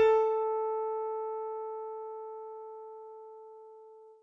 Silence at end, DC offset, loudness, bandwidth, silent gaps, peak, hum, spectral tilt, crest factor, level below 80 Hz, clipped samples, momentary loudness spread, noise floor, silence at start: 0.1 s; under 0.1%; -34 LUFS; 5.8 kHz; none; -16 dBFS; none; -4 dB/octave; 18 dB; -76 dBFS; under 0.1%; 22 LU; -53 dBFS; 0 s